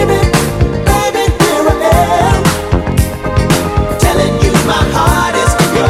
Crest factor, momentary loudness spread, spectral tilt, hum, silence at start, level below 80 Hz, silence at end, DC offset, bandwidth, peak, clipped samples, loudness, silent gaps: 10 dB; 4 LU; -5 dB/octave; none; 0 s; -18 dBFS; 0 s; under 0.1%; 16 kHz; 0 dBFS; 0.3%; -11 LUFS; none